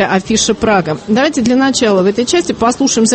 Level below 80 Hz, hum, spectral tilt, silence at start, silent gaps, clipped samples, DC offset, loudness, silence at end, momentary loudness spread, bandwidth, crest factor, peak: -42 dBFS; none; -3.5 dB/octave; 0 s; none; under 0.1%; under 0.1%; -12 LUFS; 0 s; 3 LU; 8.8 kHz; 12 dB; 0 dBFS